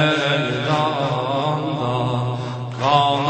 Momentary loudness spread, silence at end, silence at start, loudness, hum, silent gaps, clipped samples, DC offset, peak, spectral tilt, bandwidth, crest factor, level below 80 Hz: 7 LU; 0 s; 0 s; -20 LUFS; none; none; under 0.1%; under 0.1%; -2 dBFS; -6 dB/octave; 8.8 kHz; 18 dB; -56 dBFS